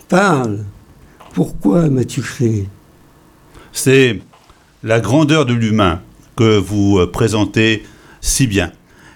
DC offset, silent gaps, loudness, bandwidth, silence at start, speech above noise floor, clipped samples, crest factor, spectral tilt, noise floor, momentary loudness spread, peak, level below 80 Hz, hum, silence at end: under 0.1%; none; -15 LUFS; 18.5 kHz; 0.1 s; 33 dB; under 0.1%; 14 dB; -5.5 dB/octave; -47 dBFS; 14 LU; 0 dBFS; -36 dBFS; none; 0.45 s